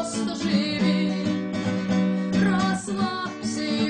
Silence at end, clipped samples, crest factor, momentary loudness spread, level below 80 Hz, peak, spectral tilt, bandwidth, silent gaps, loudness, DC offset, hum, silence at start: 0 s; under 0.1%; 12 dB; 5 LU; -58 dBFS; -12 dBFS; -5.5 dB/octave; 9.8 kHz; none; -24 LUFS; under 0.1%; none; 0 s